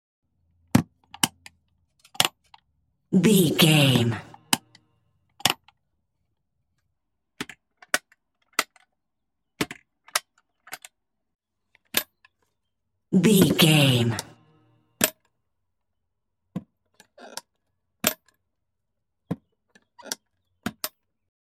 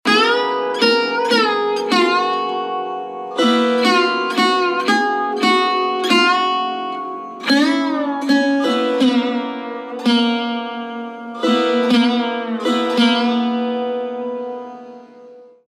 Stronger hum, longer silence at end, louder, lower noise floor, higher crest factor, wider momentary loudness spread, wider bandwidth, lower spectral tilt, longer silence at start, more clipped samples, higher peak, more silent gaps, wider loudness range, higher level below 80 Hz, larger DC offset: neither; first, 0.7 s vs 0.25 s; second, -23 LUFS vs -17 LUFS; first, -84 dBFS vs -42 dBFS; first, 26 dB vs 16 dB; first, 23 LU vs 11 LU; first, 16.5 kHz vs 14 kHz; about the same, -4 dB/octave vs -3.5 dB/octave; first, 0.75 s vs 0.05 s; neither; about the same, 0 dBFS vs -2 dBFS; first, 11.35-11.39 s vs none; first, 13 LU vs 3 LU; first, -64 dBFS vs -82 dBFS; neither